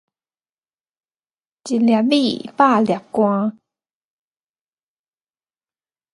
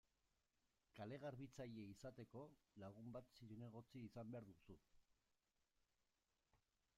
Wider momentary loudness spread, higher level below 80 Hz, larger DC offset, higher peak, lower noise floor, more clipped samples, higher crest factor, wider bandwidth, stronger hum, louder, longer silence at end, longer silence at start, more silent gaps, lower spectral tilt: about the same, 9 LU vs 8 LU; first, -68 dBFS vs -82 dBFS; neither; first, 0 dBFS vs -42 dBFS; about the same, under -90 dBFS vs under -90 dBFS; neither; about the same, 22 dB vs 18 dB; second, 11 kHz vs 13.5 kHz; neither; first, -18 LUFS vs -59 LUFS; first, 2.6 s vs 0.4 s; first, 1.65 s vs 0.95 s; neither; about the same, -6 dB/octave vs -7 dB/octave